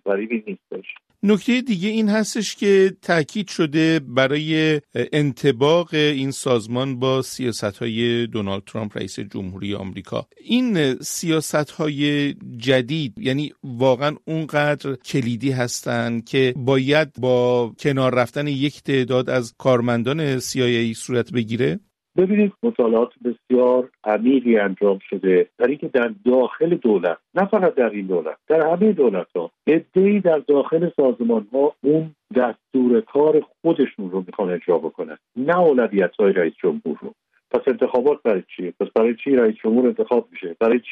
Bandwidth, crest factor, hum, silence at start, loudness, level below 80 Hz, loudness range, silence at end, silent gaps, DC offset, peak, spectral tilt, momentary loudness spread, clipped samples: 13.5 kHz; 16 dB; none; 0.05 s; -20 LUFS; -62 dBFS; 3 LU; 0 s; none; under 0.1%; -4 dBFS; -5.5 dB/octave; 10 LU; under 0.1%